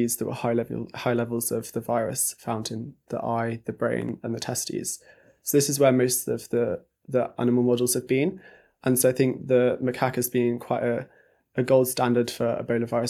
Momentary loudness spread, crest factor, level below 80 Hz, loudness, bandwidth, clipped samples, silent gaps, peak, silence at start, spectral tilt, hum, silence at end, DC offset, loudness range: 10 LU; 20 dB; -64 dBFS; -25 LUFS; 16 kHz; under 0.1%; none; -6 dBFS; 0 s; -5 dB/octave; none; 0 s; under 0.1%; 5 LU